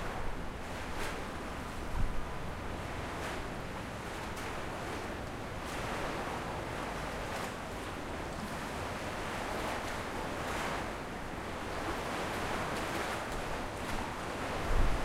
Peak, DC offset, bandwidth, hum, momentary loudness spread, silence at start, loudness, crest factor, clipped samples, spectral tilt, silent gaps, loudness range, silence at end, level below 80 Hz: -16 dBFS; under 0.1%; 16 kHz; none; 5 LU; 0 s; -38 LUFS; 20 dB; under 0.1%; -4.5 dB/octave; none; 3 LU; 0 s; -42 dBFS